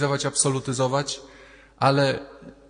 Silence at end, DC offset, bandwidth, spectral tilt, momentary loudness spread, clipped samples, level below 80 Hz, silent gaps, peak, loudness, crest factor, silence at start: 0.15 s; under 0.1%; 10 kHz; -4 dB/octave; 12 LU; under 0.1%; -58 dBFS; none; -6 dBFS; -23 LUFS; 20 dB; 0 s